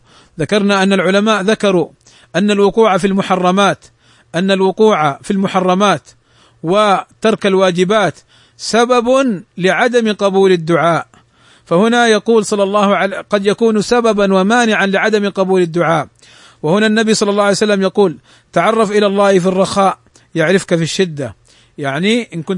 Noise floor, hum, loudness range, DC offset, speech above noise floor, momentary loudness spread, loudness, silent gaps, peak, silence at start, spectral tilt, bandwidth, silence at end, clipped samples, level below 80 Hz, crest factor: -48 dBFS; none; 2 LU; under 0.1%; 36 dB; 7 LU; -13 LUFS; none; 0 dBFS; 0.4 s; -5 dB/octave; 11 kHz; 0 s; under 0.1%; -52 dBFS; 14 dB